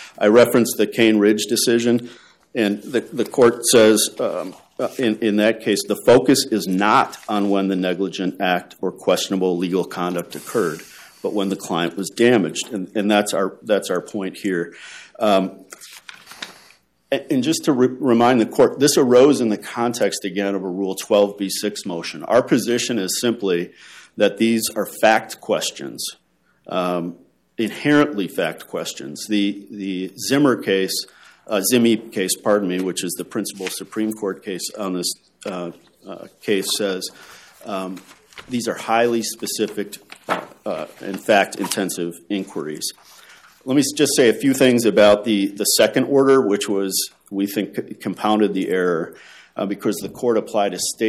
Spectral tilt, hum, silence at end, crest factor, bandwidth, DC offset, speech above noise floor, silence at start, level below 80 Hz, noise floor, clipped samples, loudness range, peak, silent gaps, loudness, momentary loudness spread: -4 dB/octave; none; 0 s; 16 dB; 16 kHz; under 0.1%; 34 dB; 0 s; -64 dBFS; -54 dBFS; under 0.1%; 7 LU; -2 dBFS; none; -19 LUFS; 14 LU